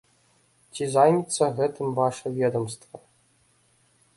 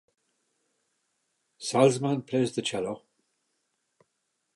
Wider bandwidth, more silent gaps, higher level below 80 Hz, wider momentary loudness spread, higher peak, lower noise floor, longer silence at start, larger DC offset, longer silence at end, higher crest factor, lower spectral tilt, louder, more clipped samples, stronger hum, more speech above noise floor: about the same, 11.5 kHz vs 11.5 kHz; neither; first, -68 dBFS vs -74 dBFS; about the same, 14 LU vs 14 LU; about the same, -4 dBFS vs -6 dBFS; second, -64 dBFS vs -79 dBFS; second, 0.75 s vs 1.6 s; neither; second, 1.2 s vs 1.55 s; about the same, 22 dB vs 24 dB; about the same, -5.5 dB/octave vs -5 dB/octave; first, -24 LUFS vs -27 LUFS; neither; neither; second, 40 dB vs 53 dB